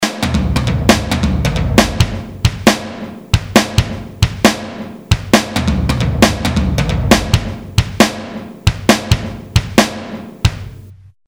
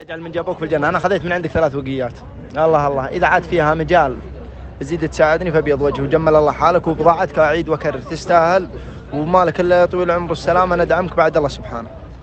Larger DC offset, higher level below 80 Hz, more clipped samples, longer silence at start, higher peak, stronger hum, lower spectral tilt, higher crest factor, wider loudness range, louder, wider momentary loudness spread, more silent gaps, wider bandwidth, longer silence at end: neither; first, -24 dBFS vs -36 dBFS; first, 0.2% vs under 0.1%; about the same, 0 s vs 0 s; about the same, 0 dBFS vs 0 dBFS; neither; second, -5 dB/octave vs -6.5 dB/octave; about the same, 14 dB vs 16 dB; about the same, 2 LU vs 2 LU; about the same, -15 LUFS vs -16 LUFS; second, 11 LU vs 14 LU; neither; first, over 20 kHz vs 8.6 kHz; first, 0.35 s vs 0 s